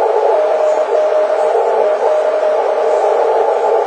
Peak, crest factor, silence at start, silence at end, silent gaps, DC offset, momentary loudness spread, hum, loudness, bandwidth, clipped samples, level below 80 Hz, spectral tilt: -2 dBFS; 12 dB; 0 s; 0 s; none; under 0.1%; 1 LU; none; -13 LUFS; 9.6 kHz; under 0.1%; -66 dBFS; -2.5 dB/octave